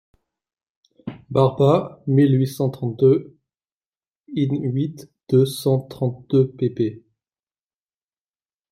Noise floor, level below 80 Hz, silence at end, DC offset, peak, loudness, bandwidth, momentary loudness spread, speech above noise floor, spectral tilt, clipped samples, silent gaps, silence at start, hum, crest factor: under -90 dBFS; -62 dBFS; 1.75 s; under 0.1%; -2 dBFS; -20 LUFS; 15 kHz; 10 LU; over 71 dB; -8 dB/octave; under 0.1%; 3.72-3.92 s, 4.20-4.24 s; 1.05 s; none; 20 dB